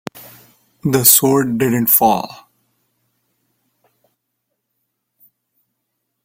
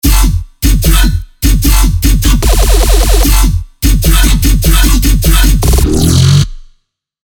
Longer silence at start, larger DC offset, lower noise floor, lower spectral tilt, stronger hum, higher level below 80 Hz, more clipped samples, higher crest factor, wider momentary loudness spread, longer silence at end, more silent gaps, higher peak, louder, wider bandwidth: about the same, 0.15 s vs 0.05 s; second, under 0.1% vs 0.4%; first, -74 dBFS vs -55 dBFS; about the same, -4 dB/octave vs -4.5 dB/octave; neither; second, -56 dBFS vs -8 dBFS; second, under 0.1% vs 0.6%; first, 20 dB vs 8 dB; first, 17 LU vs 5 LU; first, 3.9 s vs 0.65 s; neither; about the same, 0 dBFS vs 0 dBFS; second, -13 LUFS vs -10 LUFS; second, 16.5 kHz vs 19.5 kHz